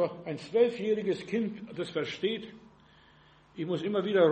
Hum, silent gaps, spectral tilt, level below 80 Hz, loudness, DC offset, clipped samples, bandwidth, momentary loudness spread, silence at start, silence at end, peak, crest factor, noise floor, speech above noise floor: none; none; -6.5 dB/octave; -70 dBFS; -31 LUFS; under 0.1%; under 0.1%; 8.4 kHz; 12 LU; 0 s; 0 s; -12 dBFS; 18 dB; -60 dBFS; 30 dB